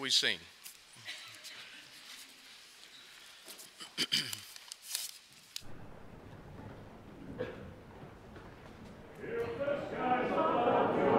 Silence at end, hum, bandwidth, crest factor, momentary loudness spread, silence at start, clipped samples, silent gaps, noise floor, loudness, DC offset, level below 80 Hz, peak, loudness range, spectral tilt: 0 s; none; 16 kHz; 22 dB; 22 LU; 0 s; under 0.1%; none; -56 dBFS; -35 LUFS; under 0.1%; -64 dBFS; -14 dBFS; 13 LU; -3 dB/octave